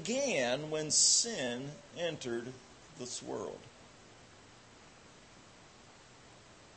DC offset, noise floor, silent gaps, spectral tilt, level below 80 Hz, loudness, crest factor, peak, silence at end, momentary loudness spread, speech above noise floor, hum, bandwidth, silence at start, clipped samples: under 0.1%; -58 dBFS; none; -1.5 dB/octave; -72 dBFS; -32 LUFS; 24 dB; -14 dBFS; 0 s; 23 LU; 23 dB; none; 8.8 kHz; 0 s; under 0.1%